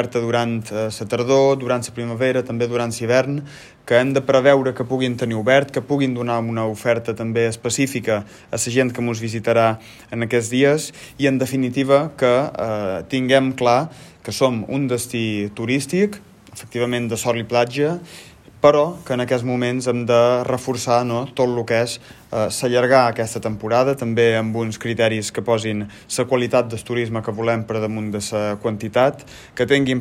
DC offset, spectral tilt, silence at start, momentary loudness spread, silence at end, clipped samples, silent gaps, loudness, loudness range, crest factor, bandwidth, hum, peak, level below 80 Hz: under 0.1%; -5 dB/octave; 0 s; 9 LU; 0 s; under 0.1%; none; -20 LUFS; 3 LU; 18 dB; 16 kHz; none; 0 dBFS; -56 dBFS